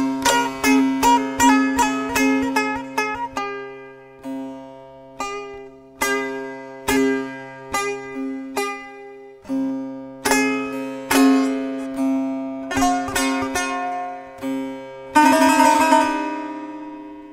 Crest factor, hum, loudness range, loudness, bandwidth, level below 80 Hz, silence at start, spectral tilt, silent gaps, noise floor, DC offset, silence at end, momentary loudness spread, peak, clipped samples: 20 dB; none; 9 LU; -20 LUFS; 16 kHz; -48 dBFS; 0 s; -3 dB/octave; none; -41 dBFS; under 0.1%; 0 s; 19 LU; -2 dBFS; under 0.1%